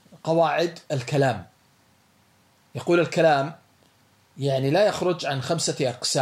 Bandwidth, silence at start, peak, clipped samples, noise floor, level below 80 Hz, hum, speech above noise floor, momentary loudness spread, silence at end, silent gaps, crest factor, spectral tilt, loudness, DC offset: 13 kHz; 0.15 s; -8 dBFS; under 0.1%; -61 dBFS; -70 dBFS; none; 38 dB; 10 LU; 0 s; none; 16 dB; -5 dB/octave; -23 LUFS; under 0.1%